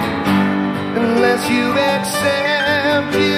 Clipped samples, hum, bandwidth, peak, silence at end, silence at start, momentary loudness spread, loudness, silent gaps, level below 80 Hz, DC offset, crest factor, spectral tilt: under 0.1%; none; 15.5 kHz; -2 dBFS; 0 s; 0 s; 3 LU; -16 LUFS; none; -50 dBFS; under 0.1%; 14 dB; -4.5 dB/octave